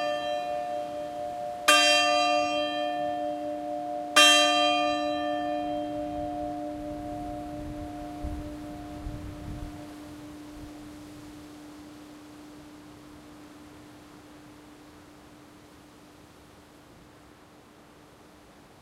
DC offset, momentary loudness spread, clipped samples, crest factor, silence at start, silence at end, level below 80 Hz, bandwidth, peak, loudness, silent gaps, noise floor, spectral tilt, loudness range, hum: under 0.1%; 28 LU; under 0.1%; 26 dB; 0 s; 0.2 s; -52 dBFS; 16 kHz; -4 dBFS; -26 LUFS; none; -53 dBFS; -2 dB/octave; 24 LU; none